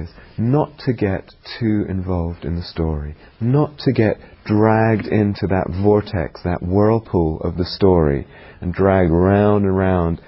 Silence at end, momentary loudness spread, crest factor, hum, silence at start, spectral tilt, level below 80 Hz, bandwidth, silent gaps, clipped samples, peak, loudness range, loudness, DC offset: 0.1 s; 11 LU; 16 dB; none; 0 s; -12.5 dB/octave; -32 dBFS; 5.8 kHz; none; under 0.1%; 0 dBFS; 5 LU; -18 LUFS; under 0.1%